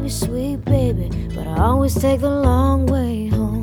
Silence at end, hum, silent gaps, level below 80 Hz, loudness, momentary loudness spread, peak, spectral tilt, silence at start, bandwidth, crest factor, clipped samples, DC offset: 0 s; none; none; -26 dBFS; -19 LUFS; 7 LU; -2 dBFS; -7.5 dB/octave; 0 s; 18 kHz; 16 dB; under 0.1%; under 0.1%